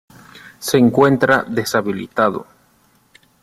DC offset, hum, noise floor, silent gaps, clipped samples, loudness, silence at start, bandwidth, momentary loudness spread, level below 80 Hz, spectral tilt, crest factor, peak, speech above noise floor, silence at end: under 0.1%; none; -56 dBFS; none; under 0.1%; -16 LUFS; 0.35 s; 15.5 kHz; 10 LU; -56 dBFS; -5.5 dB/octave; 18 dB; 0 dBFS; 41 dB; 1 s